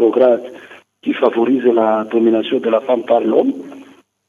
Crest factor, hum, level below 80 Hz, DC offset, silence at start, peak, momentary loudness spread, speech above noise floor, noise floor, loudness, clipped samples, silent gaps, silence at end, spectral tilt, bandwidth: 14 dB; none; -74 dBFS; under 0.1%; 0 s; -2 dBFS; 11 LU; 29 dB; -43 dBFS; -15 LUFS; under 0.1%; none; 0.45 s; -7 dB/octave; 6.8 kHz